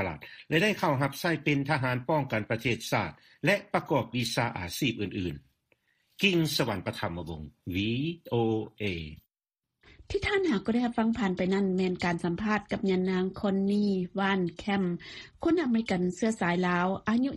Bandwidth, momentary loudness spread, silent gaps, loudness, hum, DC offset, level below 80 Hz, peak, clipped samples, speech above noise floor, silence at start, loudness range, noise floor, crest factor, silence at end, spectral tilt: 15.5 kHz; 8 LU; none; -29 LUFS; none; under 0.1%; -56 dBFS; -8 dBFS; under 0.1%; 61 dB; 0 s; 3 LU; -90 dBFS; 20 dB; 0 s; -5.5 dB/octave